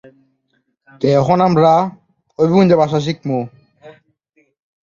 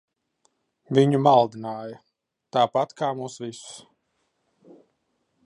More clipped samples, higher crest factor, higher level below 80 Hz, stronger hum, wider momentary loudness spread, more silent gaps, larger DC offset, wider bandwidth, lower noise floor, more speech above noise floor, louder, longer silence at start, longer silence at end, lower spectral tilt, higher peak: neither; second, 16 dB vs 22 dB; first, -54 dBFS vs -76 dBFS; neither; second, 11 LU vs 22 LU; neither; neither; second, 7.4 kHz vs 11 kHz; second, -66 dBFS vs -74 dBFS; about the same, 53 dB vs 51 dB; first, -14 LUFS vs -23 LUFS; about the same, 1 s vs 0.9 s; second, 0.95 s vs 1.65 s; first, -8 dB/octave vs -6.5 dB/octave; first, 0 dBFS vs -4 dBFS